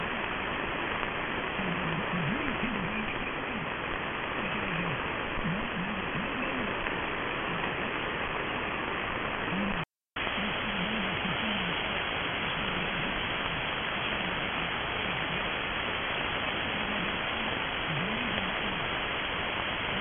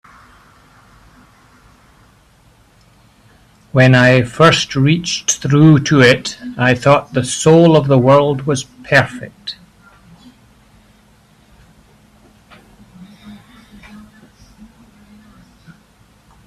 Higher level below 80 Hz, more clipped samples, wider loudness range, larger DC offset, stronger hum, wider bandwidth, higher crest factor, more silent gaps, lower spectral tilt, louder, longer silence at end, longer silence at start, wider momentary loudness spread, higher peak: about the same, -48 dBFS vs -48 dBFS; neither; second, 2 LU vs 10 LU; neither; neither; second, 4.1 kHz vs 12.5 kHz; first, 22 dB vs 16 dB; neither; second, -2 dB/octave vs -5 dB/octave; second, -31 LUFS vs -12 LUFS; second, 0 s vs 3.1 s; second, 0 s vs 3.75 s; second, 2 LU vs 14 LU; second, -12 dBFS vs 0 dBFS